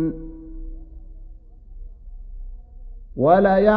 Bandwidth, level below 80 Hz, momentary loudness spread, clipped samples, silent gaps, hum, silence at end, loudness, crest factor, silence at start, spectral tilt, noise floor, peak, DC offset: 5.2 kHz; -36 dBFS; 29 LU; under 0.1%; none; none; 0 s; -17 LUFS; 20 dB; 0 s; -6.5 dB/octave; -41 dBFS; -2 dBFS; under 0.1%